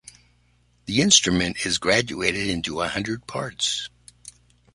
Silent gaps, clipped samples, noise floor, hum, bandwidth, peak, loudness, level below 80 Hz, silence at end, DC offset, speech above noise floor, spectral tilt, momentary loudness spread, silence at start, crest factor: none; under 0.1%; -62 dBFS; 60 Hz at -45 dBFS; 11.5 kHz; -2 dBFS; -22 LUFS; -48 dBFS; 0.45 s; under 0.1%; 39 dB; -2.5 dB/octave; 14 LU; 0.85 s; 24 dB